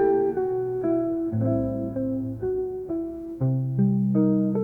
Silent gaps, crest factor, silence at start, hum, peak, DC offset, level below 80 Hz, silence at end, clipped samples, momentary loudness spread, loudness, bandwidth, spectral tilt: none; 14 dB; 0 s; none; -10 dBFS; under 0.1%; -50 dBFS; 0 s; under 0.1%; 8 LU; -25 LUFS; 2.5 kHz; -12.5 dB/octave